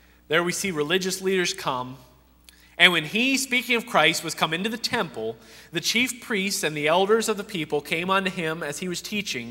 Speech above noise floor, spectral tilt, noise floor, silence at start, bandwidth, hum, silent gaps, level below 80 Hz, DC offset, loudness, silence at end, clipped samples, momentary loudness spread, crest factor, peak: 29 dB; -3 dB/octave; -54 dBFS; 0.3 s; 16 kHz; none; none; -60 dBFS; under 0.1%; -23 LUFS; 0 s; under 0.1%; 11 LU; 24 dB; 0 dBFS